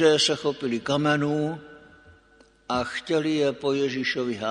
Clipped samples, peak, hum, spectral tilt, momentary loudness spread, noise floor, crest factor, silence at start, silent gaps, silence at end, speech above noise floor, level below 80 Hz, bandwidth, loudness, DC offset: under 0.1%; -6 dBFS; none; -4.5 dB/octave; 7 LU; -57 dBFS; 20 dB; 0 s; none; 0 s; 33 dB; -60 dBFS; 10.5 kHz; -25 LUFS; under 0.1%